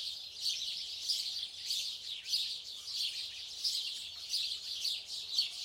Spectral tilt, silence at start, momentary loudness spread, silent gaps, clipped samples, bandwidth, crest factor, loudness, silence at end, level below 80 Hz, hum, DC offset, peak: 3 dB/octave; 0 s; 6 LU; none; under 0.1%; 16.5 kHz; 20 dB; -36 LUFS; 0 s; -78 dBFS; none; under 0.1%; -18 dBFS